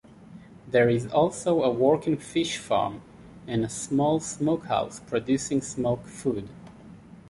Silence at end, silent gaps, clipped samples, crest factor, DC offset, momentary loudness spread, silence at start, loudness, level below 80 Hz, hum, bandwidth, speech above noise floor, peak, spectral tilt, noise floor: 0 s; none; under 0.1%; 18 dB; under 0.1%; 10 LU; 0.2 s; -26 LUFS; -56 dBFS; none; 11.5 kHz; 22 dB; -8 dBFS; -5.5 dB/octave; -48 dBFS